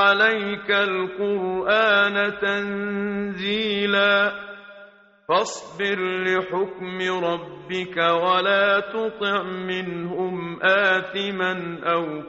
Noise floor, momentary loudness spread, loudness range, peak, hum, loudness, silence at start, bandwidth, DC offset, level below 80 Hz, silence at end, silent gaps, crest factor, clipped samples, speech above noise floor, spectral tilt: -49 dBFS; 10 LU; 3 LU; -6 dBFS; none; -22 LUFS; 0 s; 8 kHz; under 0.1%; -62 dBFS; 0 s; none; 18 dB; under 0.1%; 26 dB; -1.5 dB/octave